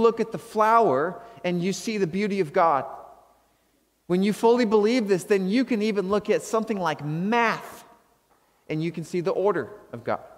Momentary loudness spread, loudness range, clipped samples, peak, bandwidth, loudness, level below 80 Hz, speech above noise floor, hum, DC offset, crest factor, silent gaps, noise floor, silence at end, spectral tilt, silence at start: 11 LU; 4 LU; under 0.1%; -6 dBFS; 16 kHz; -24 LUFS; -66 dBFS; 43 dB; none; under 0.1%; 18 dB; none; -67 dBFS; 0.05 s; -6 dB/octave; 0 s